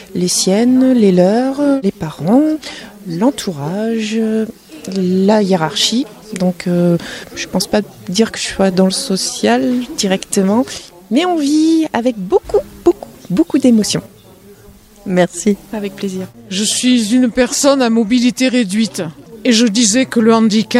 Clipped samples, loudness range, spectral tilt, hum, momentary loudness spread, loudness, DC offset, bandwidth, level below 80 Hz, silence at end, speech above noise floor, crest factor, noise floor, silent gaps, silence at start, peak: under 0.1%; 4 LU; -4.5 dB/octave; none; 11 LU; -14 LUFS; under 0.1%; 16 kHz; -48 dBFS; 0 s; 28 dB; 14 dB; -41 dBFS; none; 0 s; 0 dBFS